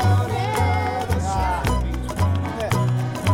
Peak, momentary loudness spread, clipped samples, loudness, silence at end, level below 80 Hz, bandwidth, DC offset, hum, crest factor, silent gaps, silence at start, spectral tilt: -8 dBFS; 3 LU; under 0.1%; -22 LUFS; 0 s; -30 dBFS; 16.5 kHz; under 0.1%; none; 12 dB; none; 0 s; -6 dB/octave